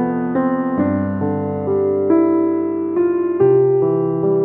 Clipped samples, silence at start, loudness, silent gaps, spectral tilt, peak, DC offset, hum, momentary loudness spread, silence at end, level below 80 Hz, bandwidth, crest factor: under 0.1%; 0 s; -17 LUFS; none; -13.5 dB/octave; -4 dBFS; under 0.1%; none; 6 LU; 0 s; -58 dBFS; 3 kHz; 12 dB